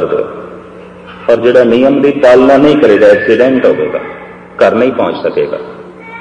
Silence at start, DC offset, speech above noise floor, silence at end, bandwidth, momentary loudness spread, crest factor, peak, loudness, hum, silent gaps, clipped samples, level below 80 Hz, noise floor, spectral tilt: 0 s; under 0.1%; 23 dB; 0 s; 9.6 kHz; 21 LU; 10 dB; 0 dBFS; -8 LUFS; none; none; 1%; -44 dBFS; -31 dBFS; -6.5 dB/octave